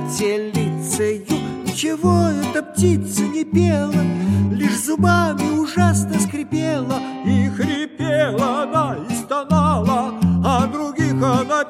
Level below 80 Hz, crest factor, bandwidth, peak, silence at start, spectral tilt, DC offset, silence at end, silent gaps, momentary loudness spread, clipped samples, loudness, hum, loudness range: -46 dBFS; 16 dB; 15.5 kHz; -2 dBFS; 0 s; -6 dB/octave; under 0.1%; 0 s; none; 6 LU; under 0.1%; -19 LUFS; none; 2 LU